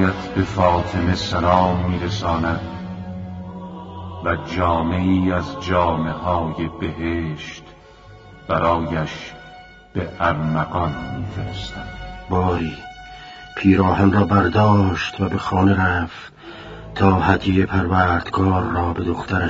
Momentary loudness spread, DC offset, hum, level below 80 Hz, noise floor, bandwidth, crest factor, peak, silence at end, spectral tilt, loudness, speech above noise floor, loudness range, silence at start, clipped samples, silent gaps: 18 LU; under 0.1%; none; -38 dBFS; -43 dBFS; 7.6 kHz; 20 dB; 0 dBFS; 0 s; -7.5 dB/octave; -20 LUFS; 25 dB; 7 LU; 0 s; under 0.1%; none